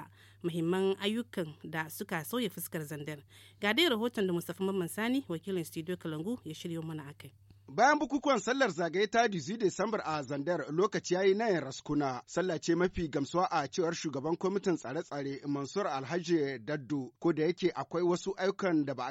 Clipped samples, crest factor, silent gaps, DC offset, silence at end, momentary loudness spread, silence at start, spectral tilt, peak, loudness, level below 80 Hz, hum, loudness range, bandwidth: under 0.1%; 20 dB; none; under 0.1%; 0 s; 11 LU; 0 s; -5 dB/octave; -14 dBFS; -33 LUFS; -64 dBFS; none; 5 LU; 16.5 kHz